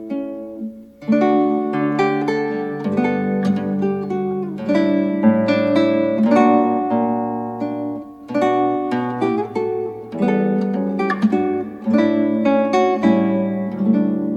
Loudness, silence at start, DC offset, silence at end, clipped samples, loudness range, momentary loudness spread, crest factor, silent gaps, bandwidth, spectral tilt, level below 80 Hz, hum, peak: -19 LUFS; 0 s; under 0.1%; 0 s; under 0.1%; 4 LU; 9 LU; 18 dB; none; 8 kHz; -8 dB/octave; -60 dBFS; none; 0 dBFS